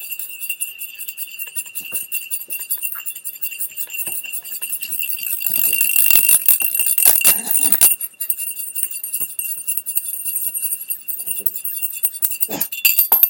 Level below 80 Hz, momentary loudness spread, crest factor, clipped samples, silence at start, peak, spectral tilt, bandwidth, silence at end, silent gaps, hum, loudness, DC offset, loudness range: -62 dBFS; 14 LU; 20 dB; under 0.1%; 0 s; 0 dBFS; 1.5 dB/octave; over 20 kHz; 0 s; none; none; -16 LUFS; under 0.1%; 11 LU